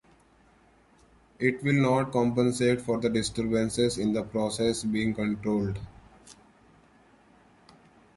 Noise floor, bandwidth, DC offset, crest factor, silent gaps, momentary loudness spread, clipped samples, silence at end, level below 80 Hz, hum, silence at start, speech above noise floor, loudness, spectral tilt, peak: -61 dBFS; 11.5 kHz; under 0.1%; 18 dB; none; 5 LU; under 0.1%; 1.85 s; -54 dBFS; none; 1.4 s; 34 dB; -27 LUFS; -5.5 dB/octave; -10 dBFS